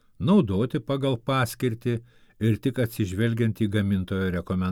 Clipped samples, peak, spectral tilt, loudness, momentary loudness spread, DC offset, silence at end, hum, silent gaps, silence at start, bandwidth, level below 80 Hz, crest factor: under 0.1%; -10 dBFS; -7 dB/octave; -26 LUFS; 6 LU; under 0.1%; 0 s; none; none; 0.2 s; 17.5 kHz; -52 dBFS; 16 dB